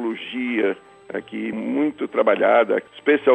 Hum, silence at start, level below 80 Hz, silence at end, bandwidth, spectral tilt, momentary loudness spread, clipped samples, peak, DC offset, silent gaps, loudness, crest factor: none; 0 s; -70 dBFS; 0 s; 8.4 kHz; -6.5 dB/octave; 14 LU; under 0.1%; -4 dBFS; under 0.1%; none; -21 LUFS; 16 dB